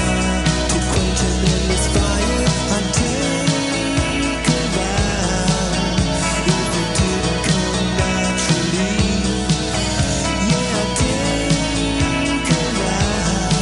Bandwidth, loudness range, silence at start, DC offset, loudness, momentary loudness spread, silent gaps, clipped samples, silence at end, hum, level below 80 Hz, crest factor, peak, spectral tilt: 11.5 kHz; 1 LU; 0 s; 0.2%; -18 LUFS; 2 LU; none; under 0.1%; 0 s; none; -26 dBFS; 16 dB; -2 dBFS; -4 dB/octave